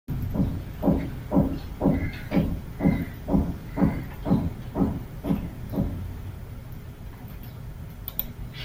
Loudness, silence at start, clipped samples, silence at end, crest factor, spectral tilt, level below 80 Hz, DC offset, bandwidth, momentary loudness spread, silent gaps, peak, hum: -28 LUFS; 0.1 s; under 0.1%; 0 s; 20 dB; -8.5 dB/octave; -38 dBFS; under 0.1%; 16.5 kHz; 15 LU; none; -6 dBFS; none